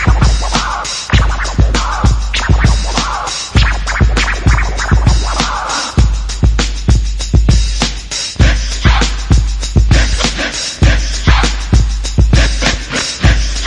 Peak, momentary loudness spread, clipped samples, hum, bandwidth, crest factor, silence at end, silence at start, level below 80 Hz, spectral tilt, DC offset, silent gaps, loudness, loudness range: 0 dBFS; 4 LU; under 0.1%; none; 11 kHz; 12 dB; 0 s; 0 s; -14 dBFS; -4 dB/octave; under 0.1%; none; -13 LUFS; 1 LU